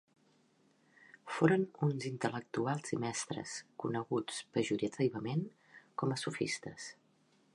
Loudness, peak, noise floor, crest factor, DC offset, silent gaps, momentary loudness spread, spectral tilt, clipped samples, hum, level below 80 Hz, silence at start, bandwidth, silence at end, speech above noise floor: -36 LUFS; -14 dBFS; -71 dBFS; 24 dB; under 0.1%; none; 13 LU; -5.5 dB/octave; under 0.1%; none; -78 dBFS; 1.25 s; 11.5 kHz; 0.65 s; 35 dB